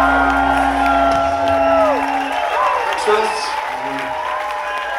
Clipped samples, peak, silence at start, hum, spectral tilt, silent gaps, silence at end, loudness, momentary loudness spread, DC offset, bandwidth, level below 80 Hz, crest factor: under 0.1%; -2 dBFS; 0 s; none; -4 dB/octave; none; 0 s; -16 LUFS; 8 LU; under 0.1%; 16 kHz; -36 dBFS; 14 dB